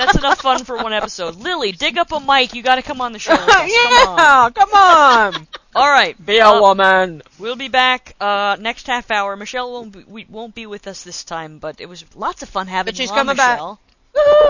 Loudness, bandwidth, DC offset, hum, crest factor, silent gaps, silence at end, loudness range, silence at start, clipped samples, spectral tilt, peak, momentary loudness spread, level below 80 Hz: -14 LUFS; 8 kHz; under 0.1%; none; 14 dB; none; 0 s; 14 LU; 0 s; 0.2%; -2.5 dB/octave; 0 dBFS; 21 LU; -42 dBFS